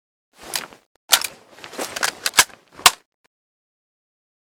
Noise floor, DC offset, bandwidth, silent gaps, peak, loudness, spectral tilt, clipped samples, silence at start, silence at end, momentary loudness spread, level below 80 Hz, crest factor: -41 dBFS; under 0.1%; 19 kHz; 0.86-1.08 s; 0 dBFS; -19 LUFS; 1.5 dB/octave; under 0.1%; 0.45 s; 1.5 s; 18 LU; -58 dBFS; 24 dB